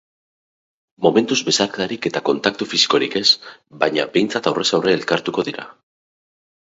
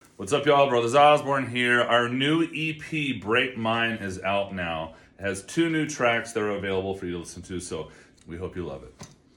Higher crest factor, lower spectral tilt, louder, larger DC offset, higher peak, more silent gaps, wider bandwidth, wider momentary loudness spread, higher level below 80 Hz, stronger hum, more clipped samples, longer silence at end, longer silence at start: about the same, 20 dB vs 18 dB; second, -3 dB/octave vs -4.5 dB/octave; first, -18 LUFS vs -24 LUFS; neither; first, 0 dBFS vs -6 dBFS; neither; second, 8 kHz vs 12.5 kHz; second, 7 LU vs 16 LU; about the same, -62 dBFS vs -58 dBFS; neither; neither; first, 1.05 s vs 0.3 s; first, 1 s vs 0.2 s